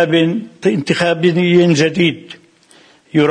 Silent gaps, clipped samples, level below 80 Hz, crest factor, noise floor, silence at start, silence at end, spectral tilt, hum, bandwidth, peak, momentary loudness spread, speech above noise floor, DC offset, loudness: none; under 0.1%; -56 dBFS; 14 dB; -48 dBFS; 0 s; 0 s; -6 dB/octave; none; 10 kHz; -2 dBFS; 7 LU; 34 dB; under 0.1%; -14 LUFS